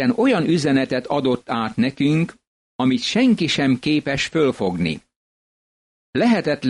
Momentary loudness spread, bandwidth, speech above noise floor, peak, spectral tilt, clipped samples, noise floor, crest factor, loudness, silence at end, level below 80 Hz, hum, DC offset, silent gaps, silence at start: 7 LU; 11 kHz; over 71 dB; -8 dBFS; -5.5 dB/octave; under 0.1%; under -90 dBFS; 12 dB; -20 LUFS; 0 s; -54 dBFS; none; under 0.1%; 2.47-2.79 s, 5.16-6.13 s; 0 s